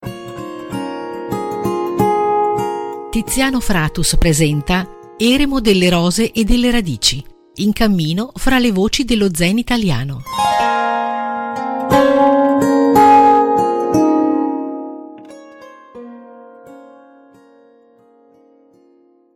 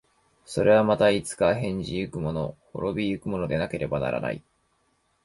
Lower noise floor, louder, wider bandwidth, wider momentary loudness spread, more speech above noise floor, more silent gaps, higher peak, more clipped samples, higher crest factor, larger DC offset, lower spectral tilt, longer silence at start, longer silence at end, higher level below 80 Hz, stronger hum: second, -52 dBFS vs -69 dBFS; first, -15 LUFS vs -26 LUFS; first, 17 kHz vs 11.5 kHz; about the same, 14 LU vs 12 LU; second, 37 dB vs 44 dB; neither; first, 0 dBFS vs -8 dBFS; neither; about the same, 16 dB vs 18 dB; neither; second, -4.5 dB/octave vs -6 dB/octave; second, 0 s vs 0.5 s; first, 2.55 s vs 0.85 s; first, -30 dBFS vs -50 dBFS; neither